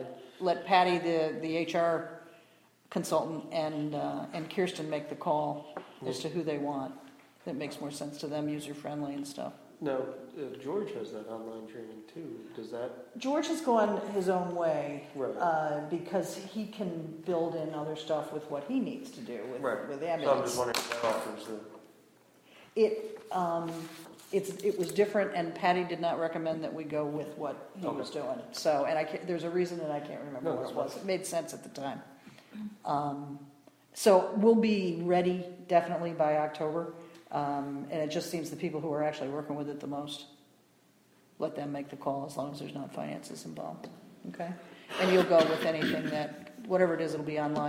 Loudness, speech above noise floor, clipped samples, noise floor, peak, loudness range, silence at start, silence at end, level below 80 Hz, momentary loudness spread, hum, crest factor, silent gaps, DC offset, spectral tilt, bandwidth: -33 LUFS; 33 dB; under 0.1%; -65 dBFS; -12 dBFS; 9 LU; 0 s; 0 s; -76 dBFS; 14 LU; none; 22 dB; none; under 0.1%; -5.5 dB/octave; 17.5 kHz